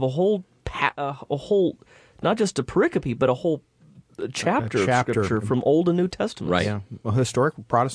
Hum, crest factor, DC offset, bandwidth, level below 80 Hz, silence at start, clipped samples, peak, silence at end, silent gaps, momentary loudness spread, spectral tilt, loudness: none; 20 dB; under 0.1%; 11 kHz; -52 dBFS; 0 s; under 0.1%; -4 dBFS; 0 s; none; 7 LU; -6 dB/octave; -24 LUFS